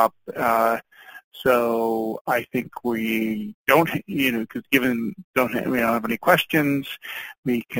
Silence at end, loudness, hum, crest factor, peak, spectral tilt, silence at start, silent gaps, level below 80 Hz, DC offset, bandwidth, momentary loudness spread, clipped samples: 0 s; -22 LUFS; none; 22 dB; -2 dBFS; -5 dB/octave; 0 s; 1.24-1.31 s, 2.21-2.25 s, 3.54-3.65 s, 5.24-5.34 s, 7.38-7.43 s; -58 dBFS; under 0.1%; 17 kHz; 10 LU; under 0.1%